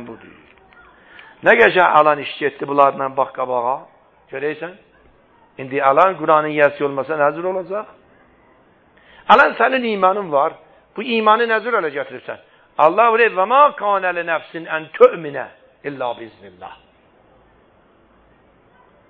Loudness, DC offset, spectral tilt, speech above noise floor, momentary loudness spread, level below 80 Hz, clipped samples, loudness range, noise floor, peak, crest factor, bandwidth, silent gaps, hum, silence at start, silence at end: -16 LUFS; under 0.1%; -6.5 dB/octave; 37 dB; 21 LU; -62 dBFS; under 0.1%; 6 LU; -53 dBFS; 0 dBFS; 18 dB; 7.2 kHz; none; none; 0 s; 2.35 s